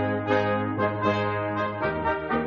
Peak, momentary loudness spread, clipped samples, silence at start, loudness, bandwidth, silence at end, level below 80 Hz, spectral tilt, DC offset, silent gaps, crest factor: -10 dBFS; 3 LU; under 0.1%; 0 s; -26 LUFS; 7.2 kHz; 0 s; -50 dBFS; -5 dB/octave; under 0.1%; none; 16 dB